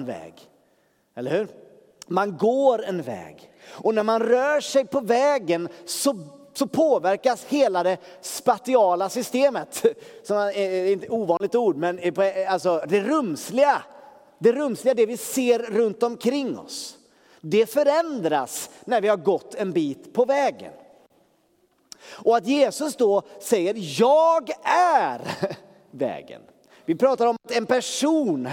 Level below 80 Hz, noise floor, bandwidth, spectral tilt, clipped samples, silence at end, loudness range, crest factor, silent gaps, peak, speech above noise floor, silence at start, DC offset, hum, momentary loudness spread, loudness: -76 dBFS; -64 dBFS; 17 kHz; -4.5 dB/octave; under 0.1%; 0 s; 3 LU; 18 dB; none; -4 dBFS; 42 dB; 0 s; under 0.1%; none; 11 LU; -23 LUFS